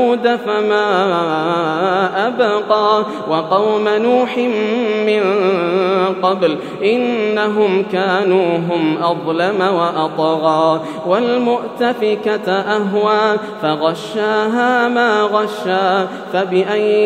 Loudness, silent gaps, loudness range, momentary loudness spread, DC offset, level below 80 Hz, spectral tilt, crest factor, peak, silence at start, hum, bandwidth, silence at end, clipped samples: -15 LUFS; none; 1 LU; 4 LU; under 0.1%; -72 dBFS; -6 dB/octave; 14 dB; 0 dBFS; 0 s; none; 10 kHz; 0 s; under 0.1%